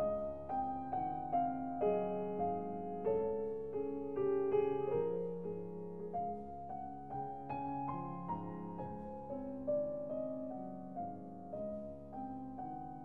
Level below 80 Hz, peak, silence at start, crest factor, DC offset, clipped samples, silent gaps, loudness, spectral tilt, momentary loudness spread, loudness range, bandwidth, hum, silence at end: -64 dBFS; -22 dBFS; 0 s; 16 dB; 0.2%; under 0.1%; none; -40 LUFS; -10.5 dB/octave; 11 LU; 6 LU; 3.6 kHz; none; 0 s